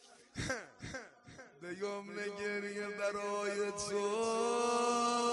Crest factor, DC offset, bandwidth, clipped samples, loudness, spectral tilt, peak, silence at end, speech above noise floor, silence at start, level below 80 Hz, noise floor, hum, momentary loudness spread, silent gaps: 16 dB; under 0.1%; 11.5 kHz; under 0.1%; -37 LUFS; -3 dB/octave; -22 dBFS; 0 s; 19 dB; 0.05 s; -66 dBFS; -57 dBFS; none; 16 LU; none